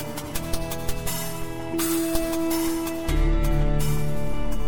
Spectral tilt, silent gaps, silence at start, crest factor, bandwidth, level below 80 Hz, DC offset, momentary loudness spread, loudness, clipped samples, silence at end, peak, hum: -5 dB/octave; none; 0 s; 14 dB; 17.5 kHz; -28 dBFS; under 0.1%; 6 LU; -27 LUFS; under 0.1%; 0 s; -8 dBFS; none